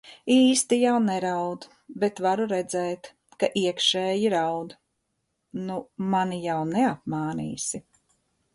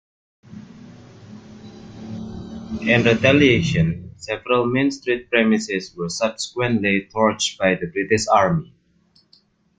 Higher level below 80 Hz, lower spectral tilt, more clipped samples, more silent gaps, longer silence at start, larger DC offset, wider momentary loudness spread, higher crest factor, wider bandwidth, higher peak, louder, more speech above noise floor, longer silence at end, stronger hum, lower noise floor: second, -66 dBFS vs -50 dBFS; about the same, -4 dB/octave vs -5 dB/octave; neither; neither; second, 0.05 s vs 0.5 s; neither; second, 13 LU vs 19 LU; about the same, 18 dB vs 20 dB; first, 11.5 kHz vs 9.4 kHz; second, -8 dBFS vs -2 dBFS; second, -25 LUFS vs -19 LUFS; first, 52 dB vs 40 dB; second, 0.75 s vs 1.15 s; neither; first, -77 dBFS vs -59 dBFS